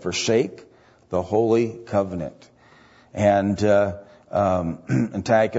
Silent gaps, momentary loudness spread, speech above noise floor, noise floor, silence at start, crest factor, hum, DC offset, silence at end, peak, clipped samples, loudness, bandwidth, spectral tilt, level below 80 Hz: none; 10 LU; 31 dB; -52 dBFS; 0 s; 18 dB; none; under 0.1%; 0 s; -6 dBFS; under 0.1%; -22 LUFS; 8 kHz; -6 dB/octave; -54 dBFS